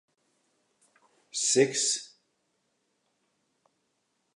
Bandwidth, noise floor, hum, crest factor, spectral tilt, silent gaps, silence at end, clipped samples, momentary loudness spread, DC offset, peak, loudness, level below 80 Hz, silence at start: 11.5 kHz; -77 dBFS; none; 24 dB; -2 dB/octave; none; 2.3 s; under 0.1%; 10 LU; under 0.1%; -10 dBFS; -26 LUFS; under -90 dBFS; 1.35 s